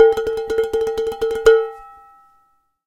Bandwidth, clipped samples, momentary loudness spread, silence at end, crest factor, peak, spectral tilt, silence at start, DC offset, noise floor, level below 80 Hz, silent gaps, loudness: 13.5 kHz; under 0.1%; 10 LU; 0.95 s; 18 dB; 0 dBFS; -3.5 dB/octave; 0 s; under 0.1%; -61 dBFS; -46 dBFS; none; -18 LUFS